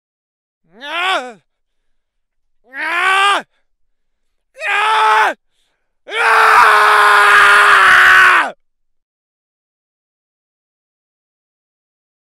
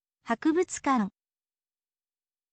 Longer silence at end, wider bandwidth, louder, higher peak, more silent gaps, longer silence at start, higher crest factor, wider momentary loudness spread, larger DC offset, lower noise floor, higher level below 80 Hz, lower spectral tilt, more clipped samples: first, 3.85 s vs 1.45 s; first, 19 kHz vs 9 kHz; first, -9 LUFS vs -28 LUFS; first, 0 dBFS vs -14 dBFS; neither; first, 0.8 s vs 0.25 s; about the same, 14 dB vs 18 dB; first, 14 LU vs 7 LU; neither; second, -66 dBFS vs under -90 dBFS; first, -56 dBFS vs -70 dBFS; second, 0 dB/octave vs -5 dB/octave; first, 0.3% vs under 0.1%